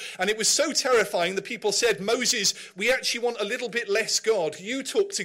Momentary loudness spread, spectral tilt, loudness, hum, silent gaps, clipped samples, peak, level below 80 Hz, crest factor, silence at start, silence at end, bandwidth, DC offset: 6 LU; -1 dB/octave; -24 LUFS; none; none; under 0.1%; -10 dBFS; -64 dBFS; 16 dB; 0 s; 0 s; 16 kHz; under 0.1%